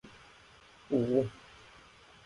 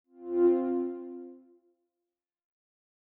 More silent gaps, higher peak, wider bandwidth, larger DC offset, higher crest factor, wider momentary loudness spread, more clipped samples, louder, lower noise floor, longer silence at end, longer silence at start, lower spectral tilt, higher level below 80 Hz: neither; about the same, -16 dBFS vs -16 dBFS; first, 11 kHz vs 2.8 kHz; neither; about the same, 20 dB vs 18 dB; first, 26 LU vs 20 LU; neither; second, -32 LUFS vs -29 LUFS; second, -58 dBFS vs -89 dBFS; second, 0.9 s vs 1.65 s; second, 0.05 s vs 0.2 s; about the same, -8 dB/octave vs -7.5 dB/octave; first, -66 dBFS vs -82 dBFS